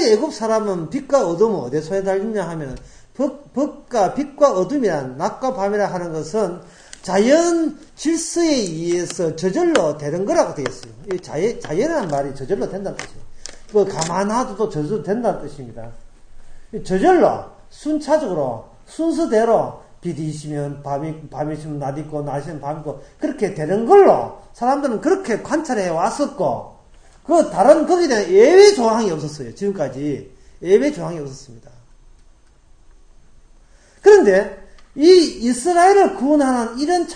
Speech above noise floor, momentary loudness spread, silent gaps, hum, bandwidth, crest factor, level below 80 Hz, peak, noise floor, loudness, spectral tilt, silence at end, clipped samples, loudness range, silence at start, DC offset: 31 dB; 17 LU; none; none; 9.8 kHz; 18 dB; -46 dBFS; 0 dBFS; -49 dBFS; -18 LUFS; -5 dB/octave; 0 s; under 0.1%; 9 LU; 0 s; under 0.1%